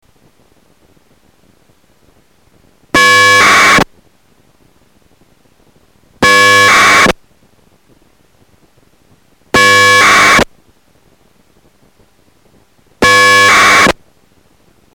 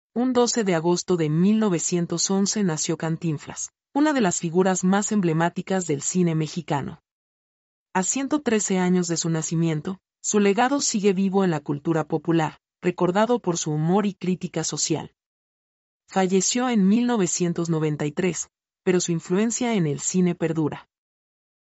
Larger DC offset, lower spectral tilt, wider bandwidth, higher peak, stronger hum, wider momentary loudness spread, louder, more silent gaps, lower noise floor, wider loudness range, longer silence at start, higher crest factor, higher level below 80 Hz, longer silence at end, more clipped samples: first, 0.2% vs under 0.1%; second, -1.5 dB/octave vs -5 dB/octave; first, 19 kHz vs 8.2 kHz; first, -2 dBFS vs -8 dBFS; neither; about the same, 9 LU vs 8 LU; first, -6 LUFS vs -23 LUFS; second, none vs 7.11-7.86 s, 15.26-16.00 s; second, -51 dBFS vs under -90 dBFS; about the same, 2 LU vs 3 LU; first, 2.95 s vs 0.15 s; second, 10 dB vs 16 dB; first, -40 dBFS vs -66 dBFS; about the same, 1 s vs 0.9 s; neither